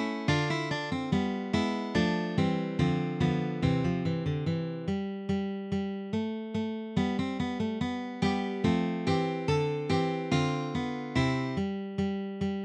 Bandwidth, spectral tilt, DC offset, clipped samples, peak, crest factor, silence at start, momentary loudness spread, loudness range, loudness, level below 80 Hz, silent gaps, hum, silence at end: 9.8 kHz; -7 dB/octave; under 0.1%; under 0.1%; -12 dBFS; 16 dB; 0 s; 5 LU; 3 LU; -30 LUFS; -52 dBFS; none; none; 0 s